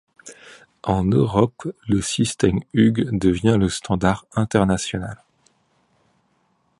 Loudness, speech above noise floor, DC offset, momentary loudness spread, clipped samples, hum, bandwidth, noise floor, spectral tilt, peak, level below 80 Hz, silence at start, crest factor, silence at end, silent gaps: -20 LUFS; 46 dB; under 0.1%; 12 LU; under 0.1%; none; 11.5 kHz; -65 dBFS; -6 dB/octave; -2 dBFS; -42 dBFS; 0.25 s; 20 dB; 1.65 s; none